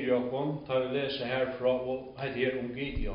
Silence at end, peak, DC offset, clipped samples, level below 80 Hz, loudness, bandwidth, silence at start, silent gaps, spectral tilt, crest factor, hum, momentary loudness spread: 0 s; -16 dBFS; under 0.1%; under 0.1%; -44 dBFS; -32 LUFS; 5.4 kHz; 0 s; none; -4 dB/octave; 16 dB; none; 6 LU